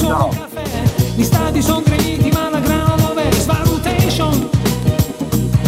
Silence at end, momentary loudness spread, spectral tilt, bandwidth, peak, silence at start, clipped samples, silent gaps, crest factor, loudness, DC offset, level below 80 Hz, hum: 0 s; 4 LU; -5.5 dB/octave; 16.5 kHz; 0 dBFS; 0 s; under 0.1%; none; 14 dB; -16 LUFS; under 0.1%; -28 dBFS; none